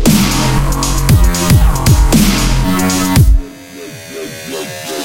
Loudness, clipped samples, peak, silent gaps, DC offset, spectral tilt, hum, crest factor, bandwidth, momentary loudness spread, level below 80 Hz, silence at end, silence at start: -12 LUFS; under 0.1%; 0 dBFS; none; under 0.1%; -5 dB/octave; none; 10 dB; 17.5 kHz; 16 LU; -14 dBFS; 0 s; 0 s